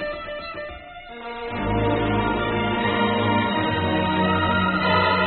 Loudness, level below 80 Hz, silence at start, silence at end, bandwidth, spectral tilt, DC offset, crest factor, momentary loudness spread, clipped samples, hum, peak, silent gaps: -22 LUFS; -40 dBFS; 0 s; 0 s; 4.5 kHz; -4 dB/octave; under 0.1%; 16 dB; 14 LU; under 0.1%; none; -6 dBFS; none